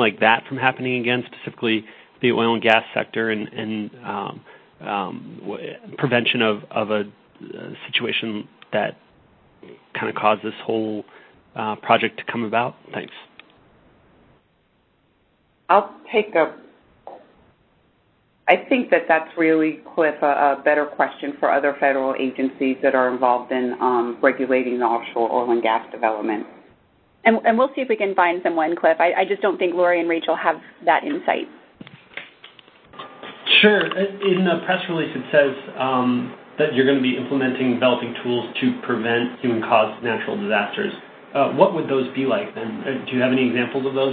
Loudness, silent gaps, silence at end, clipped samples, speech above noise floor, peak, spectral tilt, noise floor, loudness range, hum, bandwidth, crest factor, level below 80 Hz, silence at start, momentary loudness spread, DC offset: -20 LUFS; none; 0 s; under 0.1%; 42 dB; 0 dBFS; -8 dB/octave; -63 dBFS; 6 LU; none; 4.6 kHz; 22 dB; -68 dBFS; 0 s; 12 LU; under 0.1%